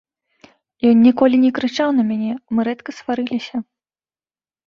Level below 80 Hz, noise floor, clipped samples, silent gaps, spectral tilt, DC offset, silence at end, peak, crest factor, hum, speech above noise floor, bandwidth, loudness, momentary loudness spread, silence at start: -60 dBFS; under -90 dBFS; under 0.1%; none; -6.5 dB/octave; under 0.1%; 1.05 s; -2 dBFS; 16 dB; none; over 74 dB; 7 kHz; -17 LUFS; 12 LU; 0.85 s